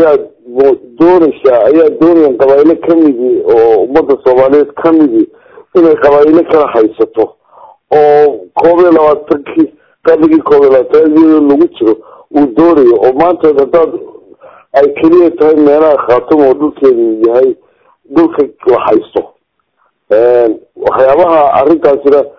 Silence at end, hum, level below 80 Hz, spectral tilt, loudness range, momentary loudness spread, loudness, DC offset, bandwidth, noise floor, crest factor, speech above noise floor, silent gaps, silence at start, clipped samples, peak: 0.1 s; none; -46 dBFS; -8.5 dB/octave; 3 LU; 7 LU; -8 LUFS; under 0.1%; 6 kHz; -58 dBFS; 8 dB; 52 dB; none; 0 s; 6%; 0 dBFS